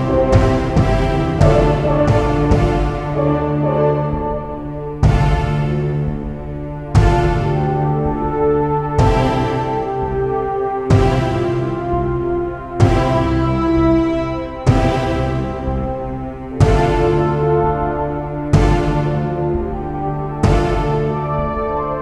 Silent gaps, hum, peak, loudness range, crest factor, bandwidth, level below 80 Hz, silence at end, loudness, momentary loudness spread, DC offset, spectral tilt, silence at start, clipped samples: none; none; 0 dBFS; 3 LU; 14 dB; 10.5 kHz; -24 dBFS; 0 s; -17 LUFS; 8 LU; under 0.1%; -8 dB/octave; 0 s; under 0.1%